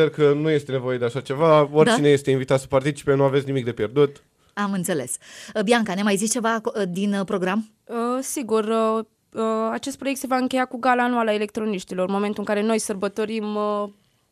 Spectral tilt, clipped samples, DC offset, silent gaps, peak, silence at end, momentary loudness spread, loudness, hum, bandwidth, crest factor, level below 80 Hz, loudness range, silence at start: -5 dB/octave; under 0.1%; under 0.1%; none; -4 dBFS; 0.4 s; 9 LU; -22 LUFS; none; 15 kHz; 18 dB; -62 dBFS; 5 LU; 0 s